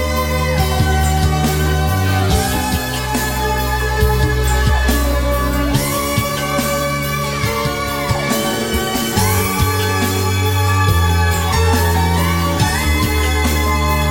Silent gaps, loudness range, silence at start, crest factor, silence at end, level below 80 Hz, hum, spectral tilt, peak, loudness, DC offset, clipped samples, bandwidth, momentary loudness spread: none; 2 LU; 0 s; 14 dB; 0 s; -22 dBFS; none; -4.5 dB/octave; -2 dBFS; -16 LUFS; under 0.1%; under 0.1%; 17 kHz; 3 LU